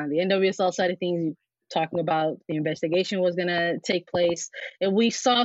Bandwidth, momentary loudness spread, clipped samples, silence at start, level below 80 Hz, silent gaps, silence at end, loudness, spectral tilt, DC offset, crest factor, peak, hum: 8 kHz; 7 LU; under 0.1%; 0 s; -70 dBFS; none; 0 s; -25 LUFS; -3.5 dB/octave; under 0.1%; 18 dB; -8 dBFS; none